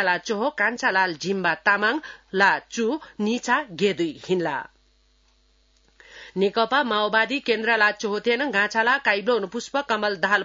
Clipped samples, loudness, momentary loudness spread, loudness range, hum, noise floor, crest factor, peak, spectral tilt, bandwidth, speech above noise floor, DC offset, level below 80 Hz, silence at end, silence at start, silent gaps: under 0.1%; -22 LUFS; 7 LU; 6 LU; none; -62 dBFS; 18 dB; -6 dBFS; -4 dB/octave; 7.8 kHz; 39 dB; under 0.1%; -64 dBFS; 0 s; 0 s; none